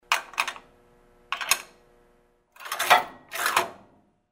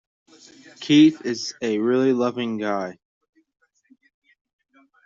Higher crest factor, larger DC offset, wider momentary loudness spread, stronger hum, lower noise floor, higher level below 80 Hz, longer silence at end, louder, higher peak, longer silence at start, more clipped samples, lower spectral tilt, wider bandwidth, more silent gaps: first, 26 dB vs 18 dB; neither; first, 19 LU vs 13 LU; neither; first, -63 dBFS vs -59 dBFS; about the same, -66 dBFS vs -68 dBFS; second, 0.55 s vs 2.15 s; second, -25 LUFS vs -21 LUFS; first, -2 dBFS vs -6 dBFS; second, 0.1 s vs 0.8 s; neither; second, 0.5 dB/octave vs -5 dB/octave; first, 16 kHz vs 7.6 kHz; neither